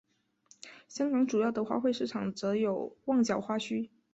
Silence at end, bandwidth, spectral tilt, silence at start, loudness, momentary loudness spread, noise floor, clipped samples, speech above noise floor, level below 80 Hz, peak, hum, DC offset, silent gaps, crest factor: 0.25 s; 8 kHz; -5.5 dB/octave; 0.65 s; -31 LUFS; 13 LU; -65 dBFS; under 0.1%; 34 dB; -72 dBFS; -16 dBFS; none; under 0.1%; none; 16 dB